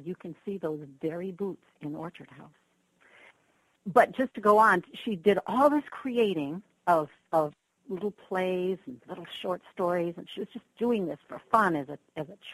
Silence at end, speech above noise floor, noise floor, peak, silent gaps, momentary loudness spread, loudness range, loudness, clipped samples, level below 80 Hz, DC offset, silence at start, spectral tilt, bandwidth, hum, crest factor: 0 s; 41 dB; -69 dBFS; -8 dBFS; none; 17 LU; 11 LU; -28 LUFS; under 0.1%; -72 dBFS; under 0.1%; 0 s; -6.5 dB/octave; 13 kHz; none; 22 dB